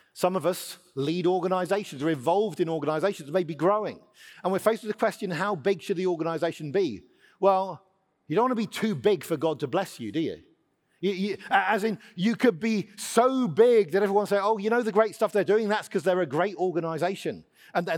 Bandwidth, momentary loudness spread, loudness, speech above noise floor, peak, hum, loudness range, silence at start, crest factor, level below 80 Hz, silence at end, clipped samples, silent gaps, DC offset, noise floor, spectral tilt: 18 kHz; 8 LU; -26 LUFS; 42 dB; -6 dBFS; none; 5 LU; 0.15 s; 20 dB; -76 dBFS; 0 s; under 0.1%; none; under 0.1%; -68 dBFS; -5.5 dB/octave